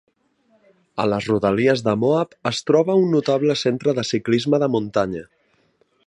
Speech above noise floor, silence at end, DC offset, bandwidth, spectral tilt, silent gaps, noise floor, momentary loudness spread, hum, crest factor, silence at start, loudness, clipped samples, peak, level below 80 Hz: 43 dB; 0.85 s; under 0.1%; 10.5 kHz; -6 dB/octave; none; -62 dBFS; 7 LU; none; 18 dB; 0.95 s; -20 LUFS; under 0.1%; -2 dBFS; -56 dBFS